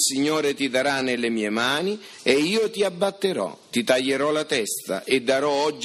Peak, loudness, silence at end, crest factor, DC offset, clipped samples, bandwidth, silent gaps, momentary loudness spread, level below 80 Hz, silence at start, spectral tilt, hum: -4 dBFS; -23 LUFS; 0 s; 20 dB; under 0.1%; under 0.1%; 15 kHz; none; 6 LU; -68 dBFS; 0 s; -3 dB/octave; none